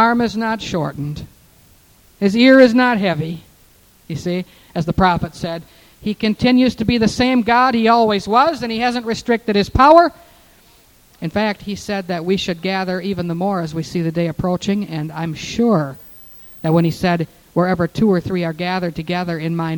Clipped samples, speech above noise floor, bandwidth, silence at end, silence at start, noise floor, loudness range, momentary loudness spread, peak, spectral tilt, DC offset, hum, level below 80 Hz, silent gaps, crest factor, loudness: under 0.1%; 34 dB; 18.5 kHz; 0 s; 0 s; -50 dBFS; 6 LU; 14 LU; 0 dBFS; -6.5 dB/octave; under 0.1%; none; -42 dBFS; none; 18 dB; -17 LUFS